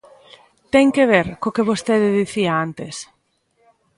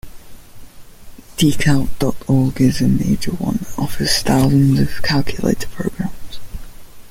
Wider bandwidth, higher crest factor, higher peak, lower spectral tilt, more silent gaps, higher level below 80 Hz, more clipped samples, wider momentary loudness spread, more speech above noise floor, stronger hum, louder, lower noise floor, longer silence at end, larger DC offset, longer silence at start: second, 11.5 kHz vs 16.5 kHz; about the same, 18 dB vs 16 dB; about the same, 0 dBFS vs -2 dBFS; about the same, -5.5 dB/octave vs -5.5 dB/octave; neither; second, -54 dBFS vs -34 dBFS; neither; about the same, 15 LU vs 15 LU; first, 47 dB vs 21 dB; neither; about the same, -18 LUFS vs -17 LUFS; first, -64 dBFS vs -36 dBFS; first, 0.95 s vs 0 s; neither; first, 0.75 s vs 0.05 s